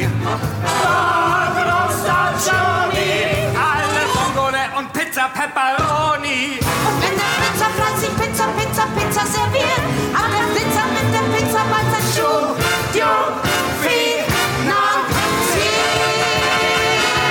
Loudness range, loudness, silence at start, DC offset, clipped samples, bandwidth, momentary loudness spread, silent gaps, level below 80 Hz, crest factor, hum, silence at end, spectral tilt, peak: 2 LU; -17 LUFS; 0 s; under 0.1%; under 0.1%; 19.5 kHz; 3 LU; none; -40 dBFS; 14 dB; none; 0 s; -3.5 dB/octave; -4 dBFS